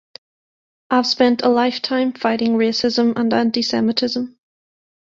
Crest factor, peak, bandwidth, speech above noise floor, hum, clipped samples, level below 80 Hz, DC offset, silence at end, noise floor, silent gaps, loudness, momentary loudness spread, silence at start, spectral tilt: 16 dB; -2 dBFS; 7.6 kHz; over 73 dB; none; under 0.1%; -62 dBFS; under 0.1%; 0.75 s; under -90 dBFS; none; -18 LUFS; 5 LU; 0.9 s; -4.5 dB/octave